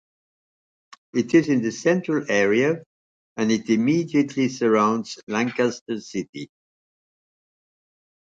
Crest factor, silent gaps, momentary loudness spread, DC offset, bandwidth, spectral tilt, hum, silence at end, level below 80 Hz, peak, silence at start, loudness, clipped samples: 18 dB; 2.86-3.36 s, 5.23-5.27 s, 5.81-5.86 s, 6.29-6.33 s; 12 LU; under 0.1%; 7.8 kHz; -5.5 dB/octave; none; 1.85 s; -68 dBFS; -6 dBFS; 1.15 s; -22 LUFS; under 0.1%